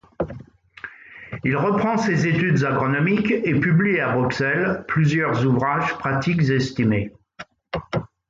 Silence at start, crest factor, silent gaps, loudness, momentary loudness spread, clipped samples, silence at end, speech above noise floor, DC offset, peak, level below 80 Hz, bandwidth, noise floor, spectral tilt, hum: 0.2 s; 14 dB; none; -21 LUFS; 19 LU; under 0.1%; 0.25 s; 24 dB; under 0.1%; -8 dBFS; -50 dBFS; 7.6 kHz; -44 dBFS; -7 dB/octave; none